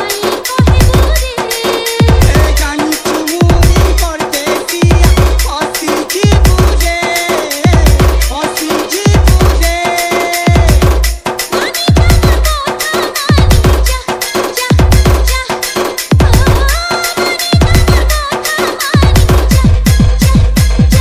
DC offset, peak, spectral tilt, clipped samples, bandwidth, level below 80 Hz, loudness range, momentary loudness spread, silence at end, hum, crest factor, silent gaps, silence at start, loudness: under 0.1%; 0 dBFS; -5 dB/octave; 1%; 16.5 kHz; -12 dBFS; 1 LU; 6 LU; 0 s; none; 8 dB; none; 0 s; -10 LUFS